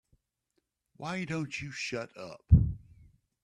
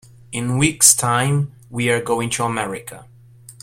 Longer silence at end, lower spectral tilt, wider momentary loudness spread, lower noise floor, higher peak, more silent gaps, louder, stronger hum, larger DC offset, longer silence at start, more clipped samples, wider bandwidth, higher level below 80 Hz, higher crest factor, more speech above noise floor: first, 0.65 s vs 0.1 s; first, -6.5 dB/octave vs -3.5 dB/octave; about the same, 18 LU vs 16 LU; first, -80 dBFS vs -44 dBFS; second, -8 dBFS vs 0 dBFS; neither; second, -31 LUFS vs -17 LUFS; neither; neither; first, 1 s vs 0.3 s; neither; second, 9.8 kHz vs 16.5 kHz; first, -40 dBFS vs -50 dBFS; about the same, 24 dB vs 20 dB; first, 51 dB vs 25 dB